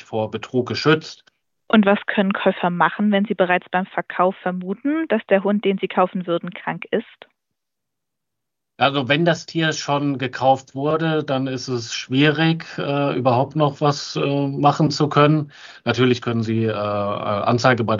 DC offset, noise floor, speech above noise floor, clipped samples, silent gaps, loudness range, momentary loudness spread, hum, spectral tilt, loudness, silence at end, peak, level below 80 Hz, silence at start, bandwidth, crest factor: under 0.1%; -83 dBFS; 64 dB; under 0.1%; none; 4 LU; 8 LU; none; -6 dB/octave; -20 LUFS; 0 s; -2 dBFS; -66 dBFS; 0.1 s; 7.6 kHz; 18 dB